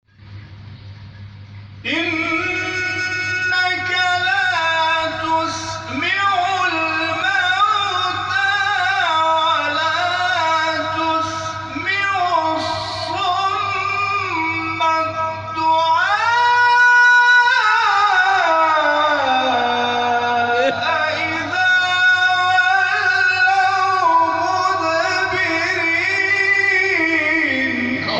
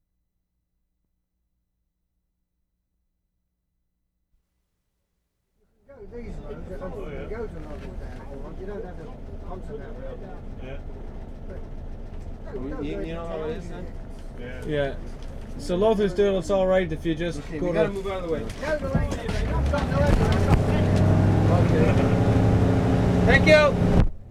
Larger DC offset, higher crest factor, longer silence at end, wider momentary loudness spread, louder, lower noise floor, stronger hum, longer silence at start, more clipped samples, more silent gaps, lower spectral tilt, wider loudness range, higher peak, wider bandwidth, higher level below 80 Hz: neither; second, 14 dB vs 22 dB; about the same, 0 s vs 0 s; second, 7 LU vs 20 LU; first, -16 LUFS vs -23 LUFS; second, -38 dBFS vs -76 dBFS; neither; second, 0.25 s vs 5.9 s; neither; neither; second, -3 dB/octave vs -7.5 dB/octave; second, 6 LU vs 19 LU; about the same, -4 dBFS vs -4 dBFS; second, 9.4 kHz vs 12.5 kHz; second, -54 dBFS vs -32 dBFS